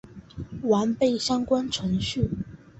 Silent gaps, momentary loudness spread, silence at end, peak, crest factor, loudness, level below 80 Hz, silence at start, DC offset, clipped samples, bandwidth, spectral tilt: none; 15 LU; 0.25 s; -10 dBFS; 16 dB; -25 LUFS; -46 dBFS; 0.05 s; under 0.1%; under 0.1%; 8.2 kHz; -5.5 dB/octave